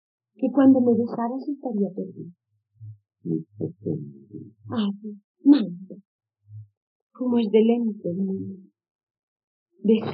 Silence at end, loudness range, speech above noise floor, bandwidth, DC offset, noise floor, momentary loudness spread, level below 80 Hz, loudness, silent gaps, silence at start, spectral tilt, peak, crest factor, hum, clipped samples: 0 s; 9 LU; 22 dB; 5 kHz; under 0.1%; -45 dBFS; 22 LU; -82 dBFS; -23 LUFS; 5.24-5.34 s, 6.05-6.19 s, 6.77-7.10 s, 8.91-9.07 s, 9.19-9.36 s, 9.44-9.66 s; 0.4 s; -7.5 dB/octave; -4 dBFS; 20 dB; none; under 0.1%